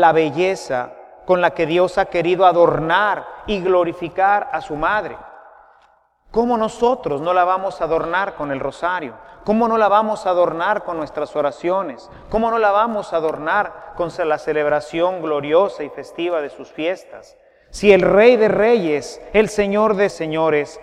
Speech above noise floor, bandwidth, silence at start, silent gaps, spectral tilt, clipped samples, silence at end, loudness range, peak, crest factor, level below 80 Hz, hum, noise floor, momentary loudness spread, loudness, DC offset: 38 dB; 11.5 kHz; 0 s; none; -5.5 dB/octave; under 0.1%; 0 s; 5 LU; 0 dBFS; 18 dB; -46 dBFS; none; -56 dBFS; 11 LU; -18 LUFS; under 0.1%